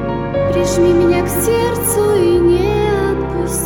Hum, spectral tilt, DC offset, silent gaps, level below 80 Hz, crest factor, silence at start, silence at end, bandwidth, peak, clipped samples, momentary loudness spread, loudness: none; -5.5 dB/octave; under 0.1%; none; -30 dBFS; 12 dB; 0 s; 0 s; 19.5 kHz; -2 dBFS; under 0.1%; 6 LU; -14 LUFS